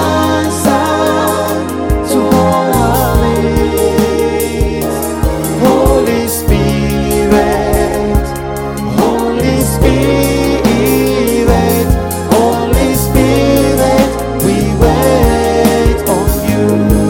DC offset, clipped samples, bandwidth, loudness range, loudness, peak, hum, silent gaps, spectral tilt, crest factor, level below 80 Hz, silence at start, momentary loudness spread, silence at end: under 0.1%; under 0.1%; 17 kHz; 2 LU; -11 LUFS; 0 dBFS; none; none; -5.5 dB/octave; 10 dB; -20 dBFS; 0 s; 5 LU; 0 s